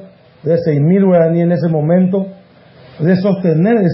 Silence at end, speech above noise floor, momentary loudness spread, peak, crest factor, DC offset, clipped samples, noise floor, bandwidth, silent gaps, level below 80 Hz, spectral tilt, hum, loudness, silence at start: 0 s; 30 dB; 8 LU; -2 dBFS; 12 dB; under 0.1%; under 0.1%; -42 dBFS; 5.8 kHz; none; -58 dBFS; -13.5 dB/octave; none; -13 LUFS; 0 s